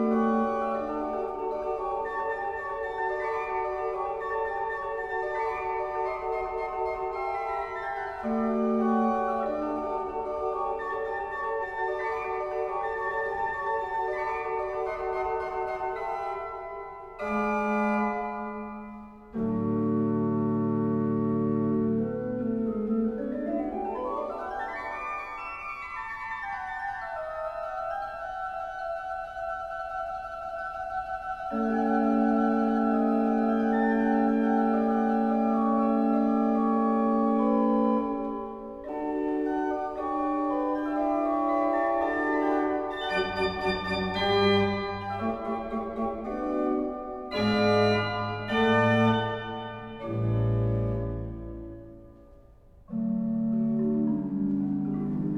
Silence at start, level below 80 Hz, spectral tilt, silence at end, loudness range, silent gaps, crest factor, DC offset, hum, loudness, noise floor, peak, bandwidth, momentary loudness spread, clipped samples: 0 s; -52 dBFS; -8 dB/octave; 0 s; 8 LU; none; 16 dB; under 0.1%; none; -28 LUFS; -53 dBFS; -12 dBFS; 7.6 kHz; 10 LU; under 0.1%